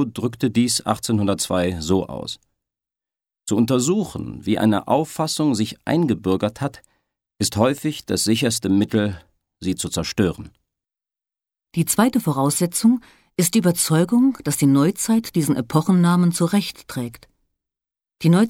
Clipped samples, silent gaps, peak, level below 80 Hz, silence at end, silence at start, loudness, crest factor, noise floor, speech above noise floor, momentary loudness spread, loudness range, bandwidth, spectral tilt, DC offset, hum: under 0.1%; none; -2 dBFS; -52 dBFS; 0 s; 0 s; -20 LUFS; 18 dB; under -90 dBFS; over 71 dB; 12 LU; 5 LU; 17 kHz; -5 dB/octave; under 0.1%; none